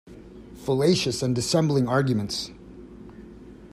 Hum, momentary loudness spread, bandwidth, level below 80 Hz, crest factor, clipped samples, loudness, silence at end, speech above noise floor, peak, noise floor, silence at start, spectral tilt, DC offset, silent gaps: none; 23 LU; 14.5 kHz; -52 dBFS; 18 dB; under 0.1%; -24 LUFS; 0.05 s; 22 dB; -8 dBFS; -44 dBFS; 0.05 s; -5.5 dB/octave; under 0.1%; none